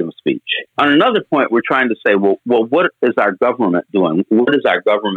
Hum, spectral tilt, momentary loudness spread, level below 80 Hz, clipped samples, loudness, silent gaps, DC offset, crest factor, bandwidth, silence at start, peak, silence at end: none; -7.5 dB/octave; 5 LU; -66 dBFS; under 0.1%; -15 LUFS; none; under 0.1%; 14 dB; 4.7 kHz; 0 s; 0 dBFS; 0 s